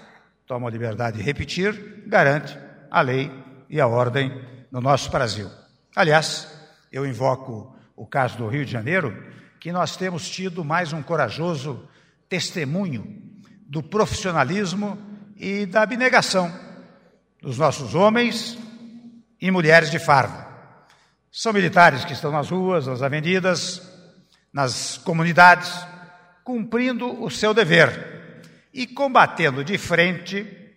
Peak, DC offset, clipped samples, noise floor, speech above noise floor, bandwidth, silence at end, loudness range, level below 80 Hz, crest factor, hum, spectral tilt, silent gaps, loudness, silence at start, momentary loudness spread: 0 dBFS; under 0.1%; under 0.1%; -58 dBFS; 37 dB; 16 kHz; 0.1 s; 7 LU; -56 dBFS; 22 dB; none; -5 dB/octave; none; -21 LUFS; 0.5 s; 19 LU